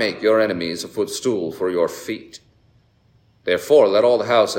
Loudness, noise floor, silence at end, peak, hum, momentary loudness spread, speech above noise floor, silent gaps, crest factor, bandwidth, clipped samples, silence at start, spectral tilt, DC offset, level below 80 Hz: -19 LUFS; -57 dBFS; 0 s; -2 dBFS; none; 14 LU; 39 dB; none; 18 dB; 16.5 kHz; under 0.1%; 0 s; -4 dB/octave; under 0.1%; -64 dBFS